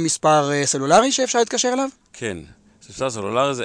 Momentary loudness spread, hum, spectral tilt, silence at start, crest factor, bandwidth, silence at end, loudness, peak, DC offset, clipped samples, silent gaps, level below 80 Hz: 14 LU; none; -3 dB/octave; 0 s; 16 dB; 10.5 kHz; 0 s; -19 LUFS; -4 dBFS; under 0.1%; under 0.1%; none; -56 dBFS